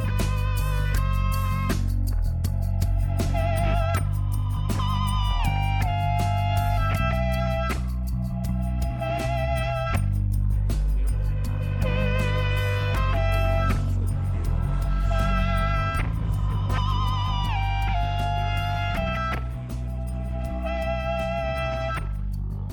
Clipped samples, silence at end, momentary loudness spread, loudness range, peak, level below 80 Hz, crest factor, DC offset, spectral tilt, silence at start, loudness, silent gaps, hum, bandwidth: under 0.1%; 0 s; 5 LU; 3 LU; -10 dBFS; -28 dBFS; 12 dB; under 0.1%; -6.5 dB/octave; 0 s; -26 LUFS; none; none; 17.5 kHz